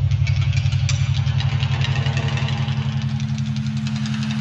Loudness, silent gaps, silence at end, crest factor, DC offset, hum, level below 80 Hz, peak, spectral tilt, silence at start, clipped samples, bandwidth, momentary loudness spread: -21 LUFS; none; 0 s; 14 dB; under 0.1%; none; -36 dBFS; -6 dBFS; -6 dB/octave; 0 s; under 0.1%; 8 kHz; 4 LU